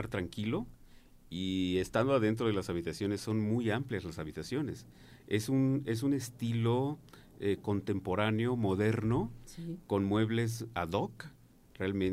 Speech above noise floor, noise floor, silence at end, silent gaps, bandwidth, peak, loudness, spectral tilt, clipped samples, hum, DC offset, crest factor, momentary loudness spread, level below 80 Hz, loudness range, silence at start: 24 dB; -57 dBFS; 0 s; none; 15.5 kHz; -14 dBFS; -34 LUFS; -6.5 dB/octave; under 0.1%; none; under 0.1%; 18 dB; 11 LU; -58 dBFS; 2 LU; 0 s